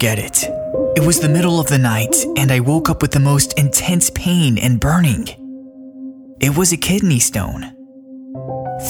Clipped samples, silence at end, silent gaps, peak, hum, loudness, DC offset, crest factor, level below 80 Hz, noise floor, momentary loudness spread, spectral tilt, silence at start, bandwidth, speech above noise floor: under 0.1%; 0 s; none; 0 dBFS; none; -15 LUFS; under 0.1%; 16 dB; -36 dBFS; -37 dBFS; 20 LU; -4.5 dB/octave; 0 s; 19 kHz; 22 dB